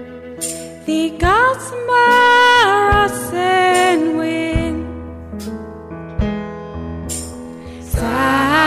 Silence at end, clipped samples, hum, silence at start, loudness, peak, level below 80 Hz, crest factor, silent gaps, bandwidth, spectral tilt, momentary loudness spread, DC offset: 0 s; under 0.1%; none; 0 s; -15 LUFS; -2 dBFS; -32 dBFS; 14 dB; none; 16 kHz; -4 dB/octave; 20 LU; under 0.1%